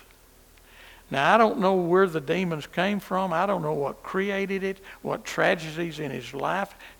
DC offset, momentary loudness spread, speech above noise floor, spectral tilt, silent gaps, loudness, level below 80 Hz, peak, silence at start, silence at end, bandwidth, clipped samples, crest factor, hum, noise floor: under 0.1%; 11 LU; 29 dB; -5.5 dB/octave; none; -25 LUFS; -58 dBFS; -4 dBFS; 0.8 s; 0.1 s; 19.5 kHz; under 0.1%; 22 dB; none; -54 dBFS